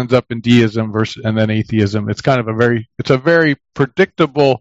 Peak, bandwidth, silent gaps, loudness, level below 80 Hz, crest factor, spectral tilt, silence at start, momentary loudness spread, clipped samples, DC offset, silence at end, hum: 0 dBFS; 8 kHz; none; -15 LUFS; -50 dBFS; 14 dB; -7 dB/octave; 0 s; 6 LU; under 0.1%; under 0.1%; 0.05 s; none